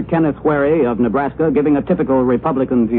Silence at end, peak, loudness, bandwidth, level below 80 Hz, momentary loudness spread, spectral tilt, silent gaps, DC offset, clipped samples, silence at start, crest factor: 0 s; -4 dBFS; -16 LUFS; 4 kHz; -40 dBFS; 2 LU; -12.5 dB/octave; none; under 0.1%; under 0.1%; 0 s; 12 dB